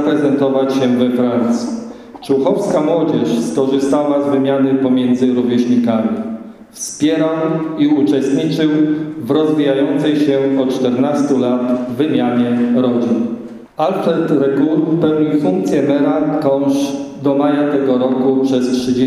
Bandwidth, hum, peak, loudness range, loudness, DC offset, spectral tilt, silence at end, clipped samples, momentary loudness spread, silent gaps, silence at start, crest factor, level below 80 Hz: 12.5 kHz; none; -2 dBFS; 1 LU; -15 LUFS; under 0.1%; -6.5 dB/octave; 0 s; under 0.1%; 5 LU; none; 0 s; 12 dB; -56 dBFS